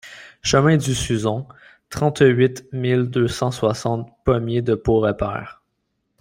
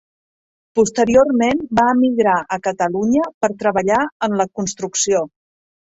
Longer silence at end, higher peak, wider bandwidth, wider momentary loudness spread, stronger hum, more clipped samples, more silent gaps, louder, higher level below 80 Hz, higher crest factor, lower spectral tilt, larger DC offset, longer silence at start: about the same, 0.7 s vs 0.65 s; about the same, -2 dBFS vs -2 dBFS; first, 16 kHz vs 8 kHz; first, 13 LU vs 8 LU; neither; neither; second, none vs 3.34-3.41 s, 4.12-4.20 s; second, -20 LUFS vs -17 LUFS; first, -44 dBFS vs -52 dBFS; about the same, 18 dB vs 16 dB; first, -6 dB/octave vs -4.5 dB/octave; neither; second, 0.05 s vs 0.75 s